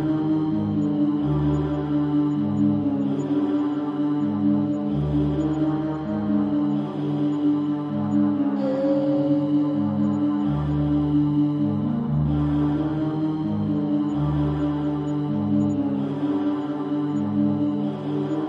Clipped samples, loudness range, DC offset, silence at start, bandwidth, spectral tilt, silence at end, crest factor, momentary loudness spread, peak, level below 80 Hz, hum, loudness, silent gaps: under 0.1%; 2 LU; under 0.1%; 0 s; 7.2 kHz; -10 dB/octave; 0 s; 12 dB; 4 LU; -10 dBFS; -44 dBFS; none; -23 LUFS; none